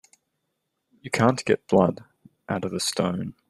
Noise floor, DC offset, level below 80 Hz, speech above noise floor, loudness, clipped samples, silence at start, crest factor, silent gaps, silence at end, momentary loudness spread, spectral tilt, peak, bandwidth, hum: -78 dBFS; under 0.1%; -62 dBFS; 55 dB; -24 LUFS; under 0.1%; 1.05 s; 22 dB; none; 0.2 s; 10 LU; -5 dB/octave; -4 dBFS; 13 kHz; none